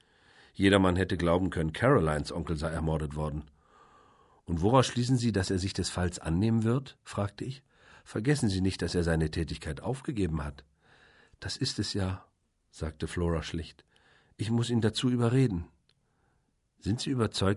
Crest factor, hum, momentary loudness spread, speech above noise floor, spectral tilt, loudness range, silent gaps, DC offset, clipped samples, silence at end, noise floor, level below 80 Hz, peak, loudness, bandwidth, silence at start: 22 dB; none; 14 LU; 44 dB; -6 dB/octave; 7 LU; none; under 0.1%; under 0.1%; 0 s; -73 dBFS; -44 dBFS; -8 dBFS; -30 LUFS; 11.5 kHz; 0.6 s